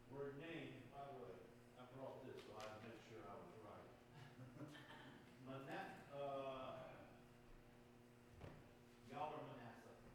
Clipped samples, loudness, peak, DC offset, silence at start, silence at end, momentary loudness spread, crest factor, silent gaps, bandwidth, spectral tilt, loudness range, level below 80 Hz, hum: under 0.1%; -57 LUFS; -36 dBFS; under 0.1%; 0 s; 0 s; 15 LU; 20 dB; none; 18 kHz; -6 dB/octave; 4 LU; -76 dBFS; none